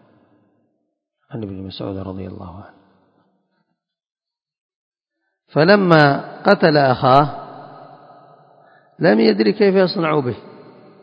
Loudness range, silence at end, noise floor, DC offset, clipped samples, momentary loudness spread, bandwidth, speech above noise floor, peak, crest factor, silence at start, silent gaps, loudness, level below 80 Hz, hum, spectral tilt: 17 LU; 0.55 s; -76 dBFS; under 0.1%; under 0.1%; 21 LU; 8 kHz; 60 dB; 0 dBFS; 20 dB; 1.3 s; 4.61-4.69 s, 4.76-4.92 s; -15 LUFS; -54 dBFS; none; -8.5 dB/octave